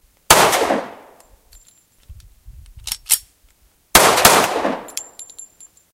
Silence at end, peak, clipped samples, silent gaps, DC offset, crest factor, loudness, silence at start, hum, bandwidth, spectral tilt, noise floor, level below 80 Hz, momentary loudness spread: 0.5 s; 0 dBFS; under 0.1%; none; under 0.1%; 20 dB; -14 LUFS; 0.3 s; none; 17 kHz; -1.5 dB/octave; -56 dBFS; -42 dBFS; 24 LU